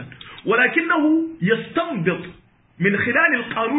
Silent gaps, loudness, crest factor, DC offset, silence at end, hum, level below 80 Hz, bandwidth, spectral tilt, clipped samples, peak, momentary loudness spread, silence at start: none; -19 LUFS; 18 dB; under 0.1%; 0 s; none; -58 dBFS; 4 kHz; -11 dB/octave; under 0.1%; -2 dBFS; 12 LU; 0 s